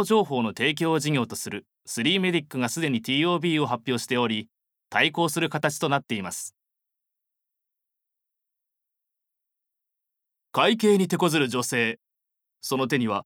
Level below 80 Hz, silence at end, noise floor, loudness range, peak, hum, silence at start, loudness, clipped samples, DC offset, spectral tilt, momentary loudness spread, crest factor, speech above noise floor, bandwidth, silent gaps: -74 dBFS; 0.05 s; -84 dBFS; 7 LU; -6 dBFS; none; 0 s; -25 LUFS; under 0.1%; under 0.1%; -4.5 dB/octave; 10 LU; 20 dB; 60 dB; 19 kHz; none